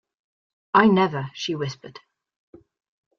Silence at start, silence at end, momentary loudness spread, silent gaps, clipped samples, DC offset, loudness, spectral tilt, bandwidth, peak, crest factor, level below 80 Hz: 0.75 s; 1.3 s; 14 LU; none; under 0.1%; under 0.1%; -21 LUFS; -6 dB/octave; 7.2 kHz; -4 dBFS; 22 dB; -64 dBFS